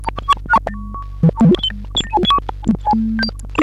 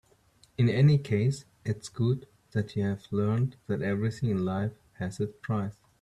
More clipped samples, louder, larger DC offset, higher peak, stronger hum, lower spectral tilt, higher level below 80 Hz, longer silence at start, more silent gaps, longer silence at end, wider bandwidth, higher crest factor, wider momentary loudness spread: neither; first, -16 LUFS vs -30 LUFS; neither; first, -6 dBFS vs -12 dBFS; neither; second, -6 dB/octave vs -8 dB/octave; first, -30 dBFS vs -60 dBFS; second, 0 s vs 0.6 s; neither; second, 0 s vs 0.3 s; about the same, 11.5 kHz vs 11 kHz; about the same, 12 dB vs 16 dB; second, 7 LU vs 13 LU